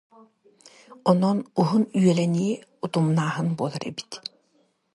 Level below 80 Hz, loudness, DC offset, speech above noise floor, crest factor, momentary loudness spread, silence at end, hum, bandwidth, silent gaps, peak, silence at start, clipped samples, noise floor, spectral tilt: -68 dBFS; -24 LUFS; under 0.1%; 43 dB; 20 dB; 13 LU; 0.75 s; none; 11.5 kHz; none; -6 dBFS; 0.9 s; under 0.1%; -66 dBFS; -7 dB/octave